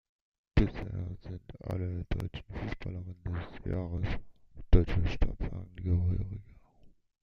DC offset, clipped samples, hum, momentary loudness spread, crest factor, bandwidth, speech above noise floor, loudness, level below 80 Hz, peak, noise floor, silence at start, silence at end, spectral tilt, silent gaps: under 0.1%; under 0.1%; none; 12 LU; 24 dB; 6.4 kHz; 23 dB; -35 LUFS; -36 dBFS; -8 dBFS; -59 dBFS; 0.55 s; 0.35 s; -8.5 dB/octave; none